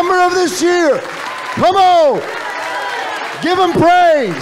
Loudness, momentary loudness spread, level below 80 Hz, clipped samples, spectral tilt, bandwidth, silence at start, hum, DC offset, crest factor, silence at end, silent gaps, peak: -13 LUFS; 12 LU; -50 dBFS; under 0.1%; -4 dB/octave; 15.5 kHz; 0 s; none; under 0.1%; 8 dB; 0 s; none; -4 dBFS